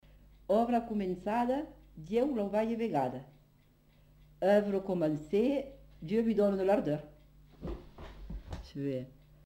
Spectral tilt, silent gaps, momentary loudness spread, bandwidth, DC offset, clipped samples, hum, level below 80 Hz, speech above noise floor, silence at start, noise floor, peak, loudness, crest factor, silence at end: -8 dB/octave; none; 19 LU; 16 kHz; under 0.1%; under 0.1%; 50 Hz at -60 dBFS; -54 dBFS; 34 dB; 0.5 s; -65 dBFS; -16 dBFS; -32 LUFS; 18 dB; 0.35 s